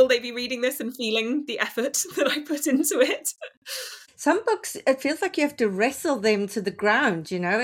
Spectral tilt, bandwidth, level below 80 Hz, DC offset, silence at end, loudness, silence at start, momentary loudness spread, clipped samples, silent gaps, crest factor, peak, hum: -3 dB/octave; 17 kHz; -70 dBFS; under 0.1%; 0 s; -24 LUFS; 0 s; 8 LU; under 0.1%; 3.57-3.62 s; 18 dB; -6 dBFS; none